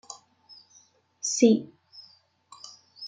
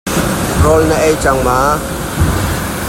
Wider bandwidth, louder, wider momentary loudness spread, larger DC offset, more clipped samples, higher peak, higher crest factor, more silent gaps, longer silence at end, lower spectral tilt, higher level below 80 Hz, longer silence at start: second, 9.4 kHz vs 16.5 kHz; second, -24 LUFS vs -13 LUFS; first, 28 LU vs 6 LU; neither; neither; second, -6 dBFS vs 0 dBFS; first, 24 dB vs 12 dB; neither; about the same, 0 s vs 0 s; about the same, -4 dB/octave vs -5 dB/octave; second, -78 dBFS vs -24 dBFS; about the same, 0.1 s vs 0.05 s